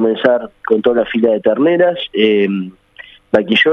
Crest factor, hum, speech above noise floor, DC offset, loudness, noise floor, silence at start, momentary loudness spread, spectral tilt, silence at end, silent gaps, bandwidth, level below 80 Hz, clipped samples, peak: 14 dB; none; 27 dB; under 0.1%; -14 LUFS; -40 dBFS; 0 s; 6 LU; -7 dB/octave; 0 s; none; 6.4 kHz; -54 dBFS; under 0.1%; 0 dBFS